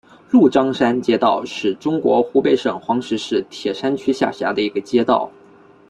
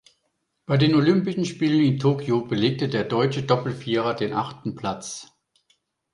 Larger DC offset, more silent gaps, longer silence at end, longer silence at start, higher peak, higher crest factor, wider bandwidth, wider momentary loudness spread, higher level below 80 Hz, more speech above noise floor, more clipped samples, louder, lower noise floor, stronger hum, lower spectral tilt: neither; neither; second, 0.6 s vs 0.9 s; second, 0.3 s vs 0.7 s; about the same, -2 dBFS vs -4 dBFS; about the same, 16 dB vs 18 dB; about the same, 10 kHz vs 11 kHz; second, 7 LU vs 11 LU; about the same, -58 dBFS vs -58 dBFS; second, 30 dB vs 52 dB; neither; first, -18 LUFS vs -23 LUFS; second, -47 dBFS vs -74 dBFS; neither; about the same, -5.5 dB/octave vs -6.5 dB/octave